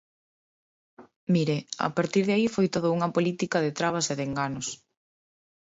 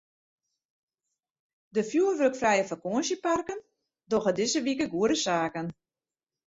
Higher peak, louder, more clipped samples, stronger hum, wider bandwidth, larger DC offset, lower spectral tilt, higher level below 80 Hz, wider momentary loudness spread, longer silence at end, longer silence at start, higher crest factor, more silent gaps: about the same, -10 dBFS vs -12 dBFS; about the same, -27 LUFS vs -28 LUFS; neither; neither; about the same, 8 kHz vs 8 kHz; neither; about the same, -5 dB/octave vs -4 dB/octave; about the same, -66 dBFS vs -66 dBFS; about the same, 7 LU vs 8 LU; about the same, 0.85 s vs 0.75 s; second, 1 s vs 1.75 s; about the same, 18 dB vs 18 dB; first, 1.16-1.27 s vs none